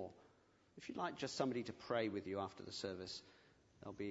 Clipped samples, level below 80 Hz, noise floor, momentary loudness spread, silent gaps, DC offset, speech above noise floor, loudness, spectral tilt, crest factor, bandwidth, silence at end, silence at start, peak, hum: under 0.1%; -80 dBFS; -73 dBFS; 13 LU; none; under 0.1%; 28 dB; -45 LUFS; -4 dB/octave; 22 dB; 7.6 kHz; 0 s; 0 s; -24 dBFS; none